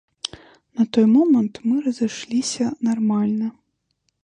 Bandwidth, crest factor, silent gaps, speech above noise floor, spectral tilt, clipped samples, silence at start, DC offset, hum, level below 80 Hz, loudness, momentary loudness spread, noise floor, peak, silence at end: 10 kHz; 16 dB; none; 52 dB; -5.5 dB/octave; under 0.1%; 0.75 s; under 0.1%; none; -64 dBFS; -20 LUFS; 16 LU; -72 dBFS; -4 dBFS; 0.75 s